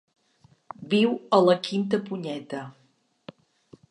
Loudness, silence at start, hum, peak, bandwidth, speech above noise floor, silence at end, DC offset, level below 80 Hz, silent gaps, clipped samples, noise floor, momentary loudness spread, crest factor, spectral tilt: -25 LUFS; 0.8 s; none; -6 dBFS; 10.5 kHz; 38 dB; 1.2 s; under 0.1%; -76 dBFS; none; under 0.1%; -61 dBFS; 22 LU; 20 dB; -6.5 dB/octave